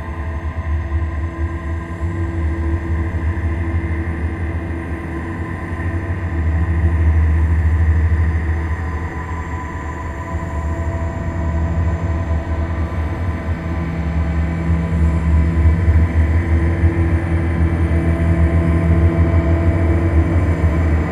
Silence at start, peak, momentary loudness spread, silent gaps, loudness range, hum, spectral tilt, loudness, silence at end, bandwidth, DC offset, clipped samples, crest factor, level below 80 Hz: 0 s; -2 dBFS; 9 LU; none; 6 LU; none; -9 dB/octave; -19 LUFS; 0 s; 7.6 kHz; under 0.1%; under 0.1%; 14 dB; -20 dBFS